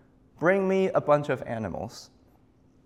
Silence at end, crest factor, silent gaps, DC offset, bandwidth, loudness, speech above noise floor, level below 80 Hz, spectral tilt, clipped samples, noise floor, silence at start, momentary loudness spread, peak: 0.8 s; 20 dB; none; under 0.1%; 12 kHz; -26 LUFS; 35 dB; -62 dBFS; -7 dB/octave; under 0.1%; -60 dBFS; 0.4 s; 15 LU; -8 dBFS